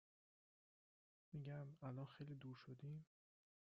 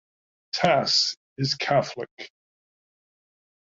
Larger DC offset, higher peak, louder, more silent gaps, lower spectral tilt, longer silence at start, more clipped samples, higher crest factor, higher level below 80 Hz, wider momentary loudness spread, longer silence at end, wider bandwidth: neither; second, -40 dBFS vs -6 dBFS; second, -56 LUFS vs -23 LUFS; second, none vs 1.17-1.36 s, 2.11-2.17 s; first, -7.5 dB/octave vs -3.5 dB/octave; first, 1.3 s vs 0.55 s; neither; second, 16 dB vs 22 dB; second, -86 dBFS vs -66 dBFS; second, 4 LU vs 18 LU; second, 0.75 s vs 1.45 s; second, 6 kHz vs 7.8 kHz